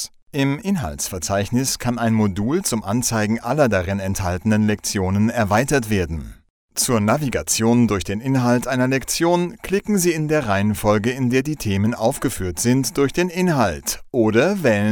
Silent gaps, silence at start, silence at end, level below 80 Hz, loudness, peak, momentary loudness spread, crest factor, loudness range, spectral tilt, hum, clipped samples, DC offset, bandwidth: 0.22-0.26 s, 6.50-6.68 s; 0 s; 0 s; -42 dBFS; -20 LUFS; -2 dBFS; 6 LU; 16 dB; 1 LU; -5 dB/octave; none; under 0.1%; under 0.1%; 20 kHz